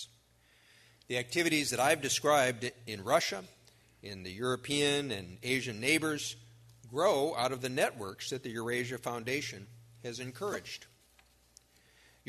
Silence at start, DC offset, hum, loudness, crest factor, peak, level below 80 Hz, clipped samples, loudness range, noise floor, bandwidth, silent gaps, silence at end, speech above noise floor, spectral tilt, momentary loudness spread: 0 s; under 0.1%; none; -32 LUFS; 22 dB; -12 dBFS; -70 dBFS; under 0.1%; 8 LU; -66 dBFS; 13.5 kHz; none; 1.45 s; 33 dB; -3 dB/octave; 15 LU